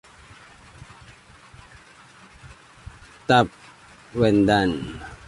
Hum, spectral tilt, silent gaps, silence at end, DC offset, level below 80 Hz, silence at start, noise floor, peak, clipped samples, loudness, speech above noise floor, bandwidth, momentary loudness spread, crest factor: none; -6 dB/octave; none; 0.1 s; under 0.1%; -48 dBFS; 2.45 s; -49 dBFS; -2 dBFS; under 0.1%; -21 LUFS; 30 dB; 11.5 kHz; 27 LU; 22 dB